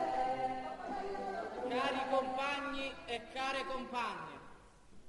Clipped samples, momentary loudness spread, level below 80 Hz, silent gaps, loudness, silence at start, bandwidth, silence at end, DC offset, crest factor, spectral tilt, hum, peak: under 0.1%; 8 LU; -62 dBFS; none; -38 LUFS; 0 s; 11.5 kHz; 0 s; under 0.1%; 16 dB; -4 dB/octave; none; -22 dBFS